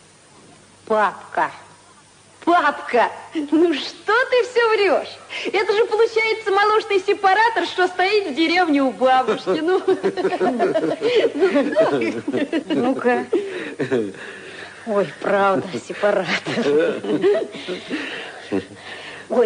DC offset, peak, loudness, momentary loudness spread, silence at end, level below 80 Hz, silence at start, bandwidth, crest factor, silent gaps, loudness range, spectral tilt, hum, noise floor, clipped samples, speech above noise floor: under 0.1%; -4 dBFS; -19 LUFS; 11 LU; 0 s; -68 dBFS; 0.9 s; 10.5 kHz; 16 dB; none; 5 LU; -4.5 dB/octave; none; -49 dBFS; under 0.1%; 30 dB